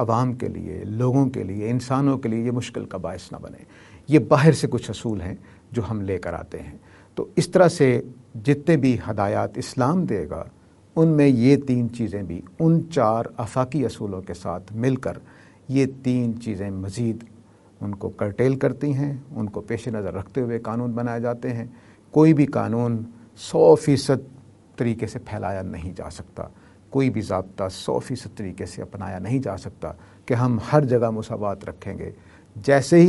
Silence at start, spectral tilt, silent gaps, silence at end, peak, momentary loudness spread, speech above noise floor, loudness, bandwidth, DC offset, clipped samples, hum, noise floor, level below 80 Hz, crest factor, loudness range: 0 s; -7.5 dB/octave; none; 0 s; 0 dBFS; 18 LU; 24 dB; -23 LUFS; 11.5 kHz; under 0.1%; under 0.1%; none; -46 dBFS; -54 dBFS; 22 dB; 7 LU